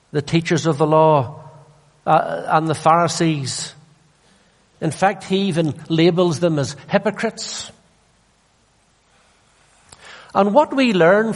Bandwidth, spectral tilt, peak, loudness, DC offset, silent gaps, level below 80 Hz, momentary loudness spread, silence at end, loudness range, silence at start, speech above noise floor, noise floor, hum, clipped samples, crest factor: 11.5 kHz; -5.5 dB/octave; -2 dBFS; -18 LUFS; under 0.1%; none; -58 dBFS; 12 LU; 0 s; 9 LU; 0.15 s; 41 dB; -59 dBFS; none; under 0.1%; 18 dB